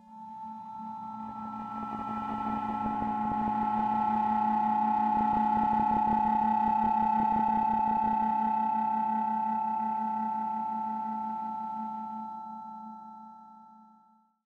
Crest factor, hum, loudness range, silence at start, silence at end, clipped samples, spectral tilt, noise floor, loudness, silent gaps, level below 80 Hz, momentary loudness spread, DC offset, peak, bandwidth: 12 dB; none; 9 LU; 0.1 s; 0.8 s; under 0.1%; -8 dB/octave; -64 dBFS; -29 LUFS; none; -60 dBFS; 15 LU; under 0.1%; -18 dBFS; 5.2 kHz